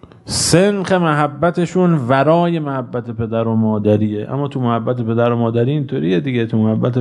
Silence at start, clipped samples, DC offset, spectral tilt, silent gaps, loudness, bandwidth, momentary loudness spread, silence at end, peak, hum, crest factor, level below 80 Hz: 0.25 s; under 0.1%; under 0.1%; -6 dB/octave; none; -16 LUFS; 11.5 kHz; 8 LU; 0 s; 0 dBFS; none; 16 dB; -50 dBFS